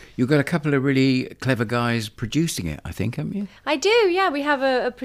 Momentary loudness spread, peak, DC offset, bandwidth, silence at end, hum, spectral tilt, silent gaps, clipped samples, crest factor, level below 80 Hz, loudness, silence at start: 10 LU; -6 dBFS; under 0.1%; 15.5 kHz; 0 s; none; -5.5 dB/octave; none; under 0.1%; 16 dB; -48 dBFS; -22 LUFS; 0 s